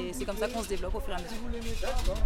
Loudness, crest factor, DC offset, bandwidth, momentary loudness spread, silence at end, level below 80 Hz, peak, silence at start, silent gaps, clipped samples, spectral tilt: -35 LUFS; 16 dB; under 0.1%; 16.5 kHz; 5 LU; 0 s; -34 dBFS; -14 dBFS; 0 s; none; under 0.1%; -4.5 dB/octave